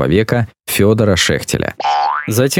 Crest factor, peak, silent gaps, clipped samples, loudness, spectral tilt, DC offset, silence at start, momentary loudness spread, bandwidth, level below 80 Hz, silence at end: 14 dB; 0 dBFS; none; under 0.1%; -15 LUFS; -4.5 dB/octave; under 0.1%; 0 s; 6 LU; 17.5 kHz; -38 dBFS; 0 s